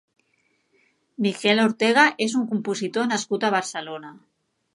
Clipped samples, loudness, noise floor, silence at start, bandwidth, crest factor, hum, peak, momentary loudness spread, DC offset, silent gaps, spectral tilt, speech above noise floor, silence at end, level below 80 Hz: under 0.1%; -22 LUFS; -68 dBFS; 1.2 s; 11.5 kHz; 22 dB; none; -2 dBFS; 14 LU; under 0.1%; none; -4 dB/octave; 46 dB; 0.6 s; -76 dBFS